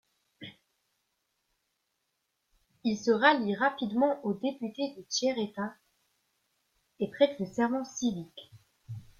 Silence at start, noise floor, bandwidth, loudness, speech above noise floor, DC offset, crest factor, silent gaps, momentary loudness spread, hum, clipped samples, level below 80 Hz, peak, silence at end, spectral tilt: 0.4 s; -81 dBFS; 11 kHz; -30 LUFS; 51 dB; under 0.1%; 22 dB; none; 23 LU; none; under 0.1%; -72 dBFS; -10 dBFS; 0.2 s; -4 dB/octave